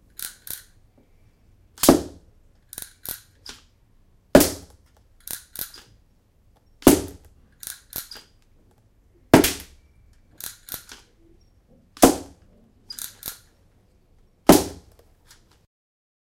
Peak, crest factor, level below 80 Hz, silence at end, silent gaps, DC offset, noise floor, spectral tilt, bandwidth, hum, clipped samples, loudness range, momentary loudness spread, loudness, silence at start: 0 dBFS; 26 dB; -46 dBFS; 1.55 s; none; under 0.1%; -59 dBFS; -4 dB/octave; 17 kHz; none; under 0.1%; 4 LU; 23 LU; -21 LUFS; 0.2 s